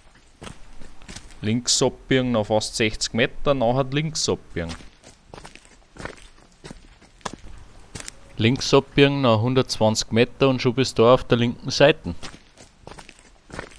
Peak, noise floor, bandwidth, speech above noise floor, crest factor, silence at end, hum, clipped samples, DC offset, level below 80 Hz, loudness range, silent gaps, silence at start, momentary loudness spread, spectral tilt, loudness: -2 dBFS; -50 dBFS; 11 kHz; 29 dB; 20 dB; 0.15 s; none; under 0.1%; under 0.1%; -42 dBFS; 17 LU; none; 0.4 s; 23 LU; -4.5 dB/octave; -21 LUFS